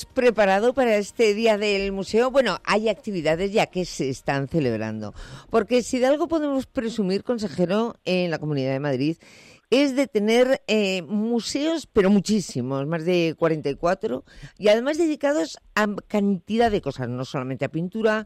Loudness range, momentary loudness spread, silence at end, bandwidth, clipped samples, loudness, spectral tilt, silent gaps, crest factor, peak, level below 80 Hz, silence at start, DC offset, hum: 3 LU; 8 LU; 0 s; 13.5 kHz; under 0.1%; -23 LUFS; -5.5 dB/octave; none; 12 dB; -10 dBFS; -52 dBFS; 0 s; under 0.1%; none